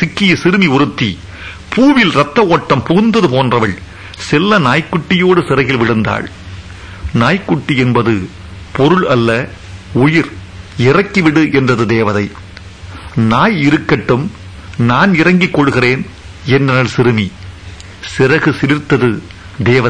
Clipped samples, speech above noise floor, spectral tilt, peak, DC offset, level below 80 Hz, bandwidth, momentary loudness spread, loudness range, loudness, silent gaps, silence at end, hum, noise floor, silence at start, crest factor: under 0.1%; 20 dB; -6.5 dB/octave; 0 dBFS; under 0.1%; -38 dBFS; 10.5 kHz; 18 LU; 3 LU; -12 LUFS; none; 0 s; none; -31 dBFS; 0 s; 12 dB